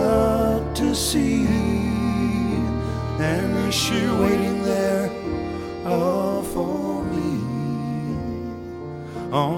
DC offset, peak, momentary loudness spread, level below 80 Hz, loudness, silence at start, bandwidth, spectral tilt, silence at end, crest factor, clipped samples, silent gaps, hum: under 0.1%; -6 dBFS; 9 LU; -36 dBFS; -23 LUFS; 0 s; 17 kHz; -5.5 dB/octave; 0 s; 16 dB; under 0.1%; none; none